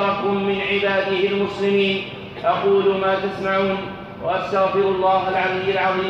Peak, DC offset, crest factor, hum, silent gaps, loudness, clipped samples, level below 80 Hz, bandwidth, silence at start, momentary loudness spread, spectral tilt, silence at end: -8 dBFS; under 0.1%; 12 dB; none; none; -20 LUFS; under 0.1%; -54 dBFS; 7.4 kHz; 0 s; 7 LU; -6.5 dB/octave; 0 s